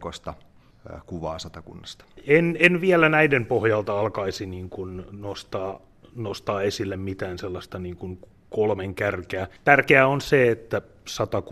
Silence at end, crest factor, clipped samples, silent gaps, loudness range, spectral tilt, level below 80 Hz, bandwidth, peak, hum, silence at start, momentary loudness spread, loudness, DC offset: 0 s; 22 dB; under 0.1%; none; 10 LU; -6 dB/octave; -54 dBFS; 14 kHz; -2 dBFS; none; 0 s; 21 LU; -22 LUFS; under 0.1%